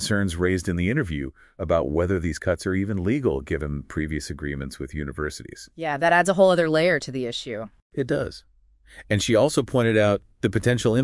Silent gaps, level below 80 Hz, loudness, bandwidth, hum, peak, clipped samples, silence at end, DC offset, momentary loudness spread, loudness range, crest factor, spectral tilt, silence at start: 7.82-7.90 s; -44 dBFS; -24 LUFS; 12 kHz; none; -6 dBFS; under 0.1%; 0 s; under 0.1%; 13 LU; 5 LU; 18 dB; -5.5 dB/octave; 0 s